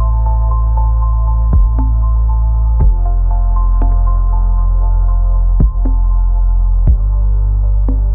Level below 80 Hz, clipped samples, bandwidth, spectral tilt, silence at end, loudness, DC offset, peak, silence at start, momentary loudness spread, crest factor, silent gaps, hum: -10 dBFS; under 0.1%; 1.5 kHz; -13.5 dB/octave; 0 s; -15 LUFS; 0.4%; -2 dBFS; 0 s; 2 LU; 8 dB; none; none